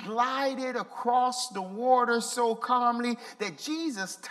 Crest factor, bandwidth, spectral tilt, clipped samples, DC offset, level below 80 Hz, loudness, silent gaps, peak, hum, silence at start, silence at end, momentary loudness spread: 18 dB; 14.5 kHz; -3 dB/octave; under 0.1%; under 0.1%; -84 dBFS; -28 LUFS; none; -12 dBFS; none; 0 s; 0 s; 9 LU